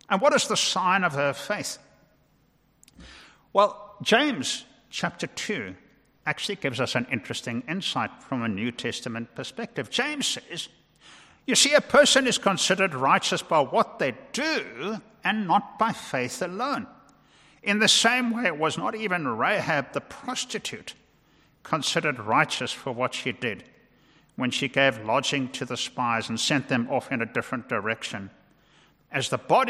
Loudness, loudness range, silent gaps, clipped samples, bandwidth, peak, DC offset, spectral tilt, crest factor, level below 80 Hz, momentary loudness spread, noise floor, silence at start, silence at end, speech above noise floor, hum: -25 LUFS; 8 LU; none; under 0.1%; 15.5 kHz; -6 dBFS; under 0.1%; -3 dB/octave; 20 dB; -66 dBFS; 13 LU; -64 dBFS; 0.1 s; 0 s; 39 dB; none